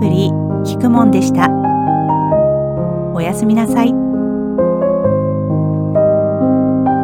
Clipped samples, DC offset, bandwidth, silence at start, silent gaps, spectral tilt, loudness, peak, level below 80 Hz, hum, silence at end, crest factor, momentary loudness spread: under 0.1%; under 0.1%; 15.5 kHz; 0 s; none; -8 dB/octave; -14 LUFS; 0 dBFS; -42 dBFS; none; 0 s; 14 dB; 6 LU